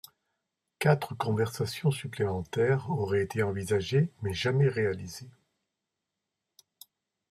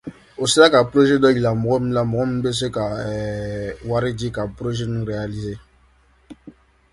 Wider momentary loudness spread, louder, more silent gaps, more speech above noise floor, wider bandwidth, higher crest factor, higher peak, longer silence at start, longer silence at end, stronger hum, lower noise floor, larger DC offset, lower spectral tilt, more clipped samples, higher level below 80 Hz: second, 6 LU vs 14 LU; second, -29 LUFS vs -20 LUFS; neither; first, 58 dB vs 37 dB; first, 14.5 kHz vs 11.5 kHz; about the same, 22 dB vs 20 dB; second, -8 dBFS vs 0 dBFS; first, 0.8 s vs 0.05 s; first, 2 s vs 0.4 s; neither; first, -86 dBFS vs -56 dBFS; neither; first, -6.5 dB/octave vs -5 dB/octave; neither; second, -64 dBFS vs -44 dBFS